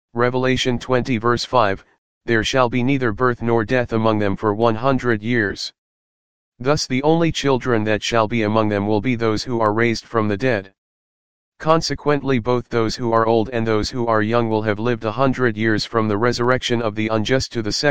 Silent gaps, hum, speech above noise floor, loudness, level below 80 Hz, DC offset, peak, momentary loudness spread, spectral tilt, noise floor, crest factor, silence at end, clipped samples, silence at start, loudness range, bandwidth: 1.98-2.21 s, 5.78-6.52 s, 10.78-11.52 s; none; over 71 dB; -19 LUFS; -44 dBFS; 2%; 0 dBFS; 4 LU; -5.5 dB/octave; under -90 dBFS; 18 dB; 0 s; under 0.1%; 0.05 s; 2 LU; 9.6 kHz